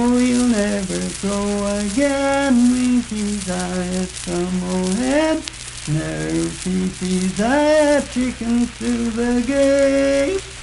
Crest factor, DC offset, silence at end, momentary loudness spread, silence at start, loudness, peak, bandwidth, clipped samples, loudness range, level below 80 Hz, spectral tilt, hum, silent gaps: 18 dB; under 0.1%; 0 s; 8 LU; 0 s; -19 LUFS; 0 dBFS; 11.5 kHz; under 0.1%; 4 LU; -38 dBFS; -5 dB/octave; none; none